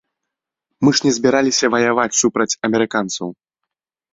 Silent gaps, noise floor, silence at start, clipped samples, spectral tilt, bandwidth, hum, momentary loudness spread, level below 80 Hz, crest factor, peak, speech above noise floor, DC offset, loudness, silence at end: none; -82 dBFS; 0.8 s; under 0.1%; -3.5 dB/octave; 8 kHz; none; 7 LU; -58 dBFS; 18 dB; 0 dBFS; 65 dB; under 0.1%; -16 LUFS; 0.8 s